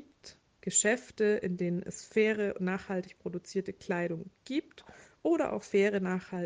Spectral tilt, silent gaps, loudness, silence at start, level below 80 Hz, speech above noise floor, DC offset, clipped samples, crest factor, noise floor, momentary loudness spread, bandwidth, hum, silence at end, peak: -4.5 dB/octave; none; -32 LUFS; 0 s; -70 dBFS; 25 dB; under 0.1%; under 0.1%; 18 dB; -57 dBFS; 9 LU; 9.6 kHz; none; 0 s; -14 dBFS